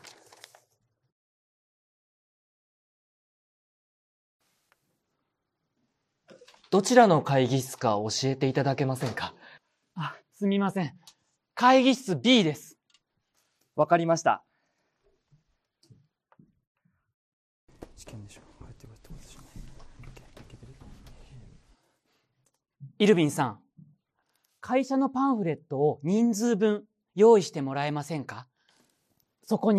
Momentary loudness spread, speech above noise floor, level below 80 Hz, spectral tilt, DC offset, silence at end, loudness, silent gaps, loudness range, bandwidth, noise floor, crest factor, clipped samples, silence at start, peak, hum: 18 LU; 57 dB; -60 dBFS; -5.5 dB/octave; under 0.1%; 0 s; -25 LUFS; 16.67-16.75 s, 17.14-17.67 s; 6 LU; 14 kHz; -81 dBFS; 26 dB; under 0.1%; 6.7 s; -4 dBFS; none